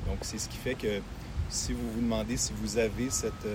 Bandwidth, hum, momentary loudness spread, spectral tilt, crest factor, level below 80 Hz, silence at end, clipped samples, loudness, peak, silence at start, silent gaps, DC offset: 16.5 kHz; none; 5 LU; -4 dB/octave; 16 dB; -42 dBFS; 0 s; under 0.1%; -32 LUFS; -16 dBFS; 0 s; none; under 0.1%